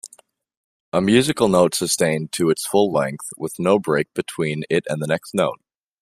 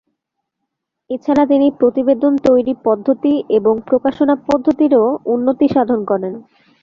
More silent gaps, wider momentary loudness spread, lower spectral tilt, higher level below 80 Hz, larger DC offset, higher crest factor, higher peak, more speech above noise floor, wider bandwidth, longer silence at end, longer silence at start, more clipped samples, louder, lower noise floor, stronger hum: first, 0.57-0.92 s vs none; first, 9 LU vs 6 LU; second, -4.5 dB/octave vs -8 dB/octave; about the same, -56 dBFS vs -54 dBFS; neither; about the same, 18 dB vs 14 dB; about the same, -2 dBFS vs -2 dBFS; second, 34 dB vs 62 dB; first, 15.5 kHz vs 7.2 kHz; about the same, 0.45 s vs 0.4 s; second, 0.05 s vs 1.1 s; neither; second, -20 LUFS vs -15 LUFS; second, -53 dBFS vs -76 dBFS; neither